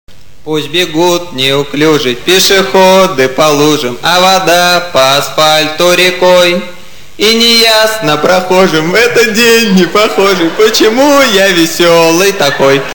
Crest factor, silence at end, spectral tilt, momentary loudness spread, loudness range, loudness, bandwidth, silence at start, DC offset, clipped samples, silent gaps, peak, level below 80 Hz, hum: 8 dB; 0 s; -3 dB/octave; 5 LU; 1 LU; -7 LUFS; 18.5 kHz; 0.45 s; 4%; 0.2%; none; 0 dBFS; -42 dBFS; none